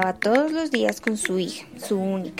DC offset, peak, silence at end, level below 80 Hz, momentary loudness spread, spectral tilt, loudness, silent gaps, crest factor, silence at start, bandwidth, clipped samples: 0.1%; -4 dBFS; 0 s; -62 dBFS; 8 LU; -4.5 dB/octave; -24 LUFS; none; 20 dB; 0 s; 16 kHz; under 0.1%